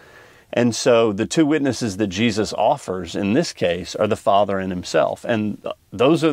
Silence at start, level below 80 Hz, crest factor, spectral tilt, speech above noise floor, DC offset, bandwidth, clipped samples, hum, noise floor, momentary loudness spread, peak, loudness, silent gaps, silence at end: 0.5 s; -54 dBFS; 16 dB; -5 dB/octave; 28 dB; under 0.1%; 15.5 kHz; under 0.1%; none; -47 dBFS; 8 LU; -2 dBFS; -20 LUFS; none; 0 s